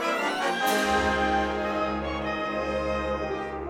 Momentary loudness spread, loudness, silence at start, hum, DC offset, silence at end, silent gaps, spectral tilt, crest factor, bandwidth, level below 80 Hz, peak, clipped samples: 6 LU; -27 LUFS; 0 s; none; under 0.1%; 0 s; none; -4 dB/octave; 14 dB; 18.5 kHz; -42 dBFS; -12 dBFS; under 0.1%